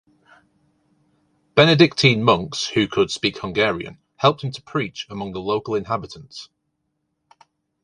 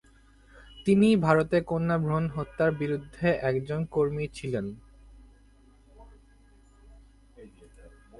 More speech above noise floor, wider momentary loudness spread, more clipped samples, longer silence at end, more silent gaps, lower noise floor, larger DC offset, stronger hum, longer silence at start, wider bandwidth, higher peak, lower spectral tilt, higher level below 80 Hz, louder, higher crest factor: first, 54 dB vs 32 dB; first, 16 LU vs 12 LU; neither; first, 1.4 s vs 0.3 s; neither; first, -74 dBFS vs -57 dBFS; neither; neither; first, 1.55 s vs 0.7 s; about the same, 11 kHz vs 11.5 kHz; first, 0 dBFS vs -6 dBFS; second, -5 dB/octave vs -7.5 dB/octave; about the same, -54 dBFS vs -52 dBFS; first, -20 LUFS vs -27 LUFS; about the same, 22 dB vs 22 dB